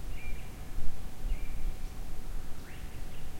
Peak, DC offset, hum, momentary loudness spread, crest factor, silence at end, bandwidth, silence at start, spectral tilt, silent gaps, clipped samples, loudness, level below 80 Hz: -12 dBFS; under 0.1%; none; 5 LU; 16 dB; 0 s; 15.5 kHz; 0 s; -5 dB/octave; none; under 0.1%; -44 LUFS; -36 dBFS